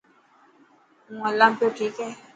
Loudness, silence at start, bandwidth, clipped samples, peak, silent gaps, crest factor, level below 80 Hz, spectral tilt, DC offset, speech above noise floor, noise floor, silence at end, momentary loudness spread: -23 LUFS; 1.1 s; 9 kHz; under 0.1%; -2 dBFS; none; 24 dB; -78 dBFS; -4 dB/octave; under 0.1%; 35 dB; -58 dBFS; 0.2 s; 15 LU